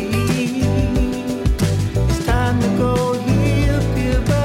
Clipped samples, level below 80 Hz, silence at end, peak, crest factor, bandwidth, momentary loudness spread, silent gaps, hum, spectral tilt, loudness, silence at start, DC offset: under 0.1%; -24 dBFS; 0 s; -8 dBFS; 10 dB; 16 kHz; 2 LU; none; none; -6.5 dB/octave; -18 LUFS; 0 s; under 0.1%